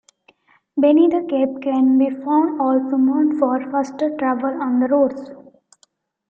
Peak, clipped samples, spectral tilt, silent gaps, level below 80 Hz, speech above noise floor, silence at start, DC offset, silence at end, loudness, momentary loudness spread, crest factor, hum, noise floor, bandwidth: -4 dBFS; under 0.1%; -6.5 dB/octave; none; -68 dBFS; 44 dB; 0.75 s; under 0.1%; 0.9 s; -18 LUFS; 7 LU; 14 dB; none; -61 dBFS; 7.4 kHz